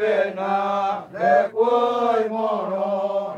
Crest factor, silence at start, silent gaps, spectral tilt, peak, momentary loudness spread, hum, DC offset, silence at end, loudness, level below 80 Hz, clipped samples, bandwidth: 16 dB; 0 s; none; -6 dB/octave; -6 dBFS; 5 LU; none; under 0.1%; 0 s; -21 LUFS; -78 dBFS; under 0.1%; 9 kHz